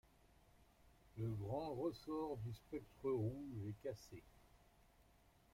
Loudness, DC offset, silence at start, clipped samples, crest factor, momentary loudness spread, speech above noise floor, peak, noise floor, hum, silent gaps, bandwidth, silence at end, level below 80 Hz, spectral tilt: -47 LUFS; under 0.1%; 0.6 s; under 0.1%; 16 dB; 12 LU; 26 dB; -32 dBFS; -72 dBFS; none; none; 16 kHz; 0.5 s; -70 dBFS; -8 dB/octave